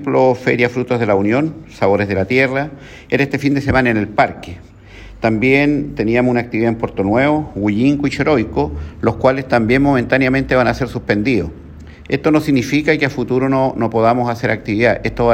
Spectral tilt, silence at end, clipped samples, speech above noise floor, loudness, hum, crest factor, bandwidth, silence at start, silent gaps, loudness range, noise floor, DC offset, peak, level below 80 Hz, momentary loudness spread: -7 dB/octave; 0 s; under 0.1%; 22 dB; -16 LUFS; none; 14 dB; 15 kHz; 0 s; none; 1 LU; -37 dBFS; under 0.1%; 0 dBFS; -38 dBFS; 6 LU